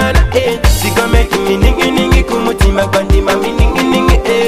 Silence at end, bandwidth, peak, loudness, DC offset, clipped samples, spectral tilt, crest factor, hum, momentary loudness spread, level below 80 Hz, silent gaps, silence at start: 0 s; 16 kHz; 0 dBFS; -11 LUFS; under 0.1%; under 0.1%; -5.5 dB/octave; 10 dB; none; 2 LU; -14 dBFS; none; 0 s